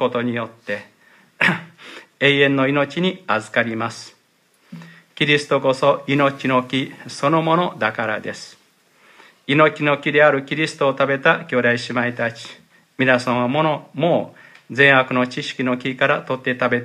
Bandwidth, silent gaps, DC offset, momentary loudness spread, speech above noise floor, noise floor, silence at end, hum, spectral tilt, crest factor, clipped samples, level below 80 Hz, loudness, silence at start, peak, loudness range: 12.5 kHz; none; under 0.1%; 14 LU; 41 dB; -60 dBFS; 0 s; none; -5.5 dB/octave; 20 dB; under 0.1%; -68 dBFS; -18 LUFS; 0 s; 0 dBFS; 3 LU